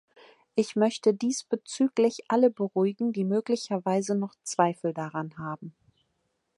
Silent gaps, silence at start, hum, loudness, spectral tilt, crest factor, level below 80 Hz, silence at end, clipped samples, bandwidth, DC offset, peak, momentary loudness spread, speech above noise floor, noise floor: none; 0.55 s; none; -28 LUFS; -5.5 dB/octave; 20 dB; -76 dBFS; 0.85 s; under 0.1%; 11.5 kHz; under 0.1%; -8 dBFS; 10 LU; 50 dB; -77 dBFS